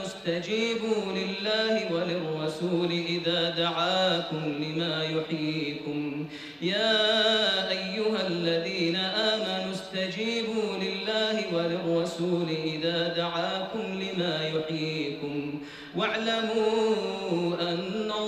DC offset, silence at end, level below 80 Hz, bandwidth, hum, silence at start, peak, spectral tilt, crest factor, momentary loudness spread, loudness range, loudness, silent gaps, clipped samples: under 0.1%; 0 s; -66 dBFS; 15 kHz; none; 0 s; -12 dBFS; -5 dB/octave; 16 dB; 7 LU; 3 LU; -28 LUFS; none; under 0.1%